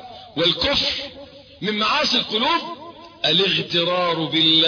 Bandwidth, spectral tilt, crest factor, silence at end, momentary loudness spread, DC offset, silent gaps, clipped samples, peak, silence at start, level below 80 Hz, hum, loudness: 5.4 kHz; -4 dB/octave; 16 dB; 0 s; 12 LU; under 0.1%; none; under 0.1%; -4 dBFS; 0 s; -50 dBFS; none; -19 LUFS